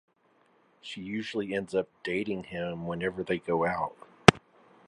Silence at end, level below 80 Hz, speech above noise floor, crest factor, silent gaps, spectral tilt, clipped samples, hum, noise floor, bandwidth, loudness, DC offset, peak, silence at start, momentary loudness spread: 0.5 s; -54 dBFS; 35 dB; 30 dB; none; -5 dB/octave; under 0.1%; none; -67 dBFS; 11.5 kHz; -29 LUFS; under 0.1%; 0 dBFS; 0.85 s; 15 LU